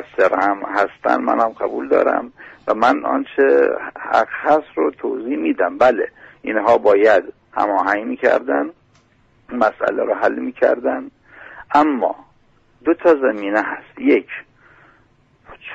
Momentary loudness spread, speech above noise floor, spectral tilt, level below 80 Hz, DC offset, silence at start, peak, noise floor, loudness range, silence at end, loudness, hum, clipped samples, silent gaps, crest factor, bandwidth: 12 LU; 39 dB; -5.5 dB/octave; -58 dBFS; under 0.1%; 0 s; -2 dBFS; -56 dBFS; 3 LU; 0 s; -18 LUFS; none; under 0.1%; none; 16 dB; 8 kHz